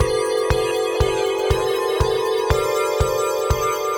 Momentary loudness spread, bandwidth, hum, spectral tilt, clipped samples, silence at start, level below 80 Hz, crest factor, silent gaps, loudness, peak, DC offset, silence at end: 1 LU; over 20 kHz; none; -4.5 dB/octave; under 0.1%; 0 s; -30 dBFS; 18 dB; none; -20 LUFS; -2 dBFS; under 0.1%; 0 s